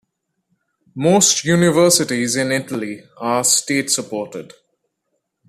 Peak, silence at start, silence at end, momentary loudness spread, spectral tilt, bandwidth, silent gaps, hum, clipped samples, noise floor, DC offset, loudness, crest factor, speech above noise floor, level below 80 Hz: 0 dBFS; 0.95 s; 1.05 s; 15 LU; -3 dB/octave; 14.5 kHz; none; none; under 0.1%; -73 dBFS; under 0.1%; -16 LUFS; 18 dB; 56 dB; -58 dBFS